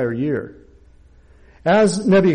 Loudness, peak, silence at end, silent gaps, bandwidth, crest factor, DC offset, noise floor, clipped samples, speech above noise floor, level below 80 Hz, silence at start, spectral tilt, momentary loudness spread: -18 LUFS; -8 dBFS; 0 s; none; 10.5 kHz; 12 dB; under 0.1%; -48 dBFS; under 0.1%; 32 dB; -48 dBFS; 0 s; -6 dB/octave; 12 LU